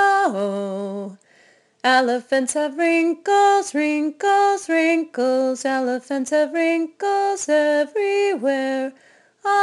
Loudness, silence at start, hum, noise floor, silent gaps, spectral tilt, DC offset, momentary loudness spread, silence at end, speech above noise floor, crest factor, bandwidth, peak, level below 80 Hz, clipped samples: -20 LUFS; 0 s; none; -56 dBFS; none; -3.5 dB/octave; under 0.1%; 8 LU; 0 s; 36 dB; 18 dB; 12 kHz; -2 dBFS; -70 dBFS; under 0.1%